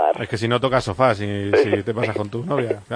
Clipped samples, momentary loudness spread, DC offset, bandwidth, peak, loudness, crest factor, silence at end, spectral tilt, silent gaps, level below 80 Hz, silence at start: under 0.1%; 6 LU; under 0.1%; 10.5 kHz; -2 dBFS; -21 LUFS; 18 dB; 0 s; -6.5 dB/octave; none; -50 dBFS; 0 s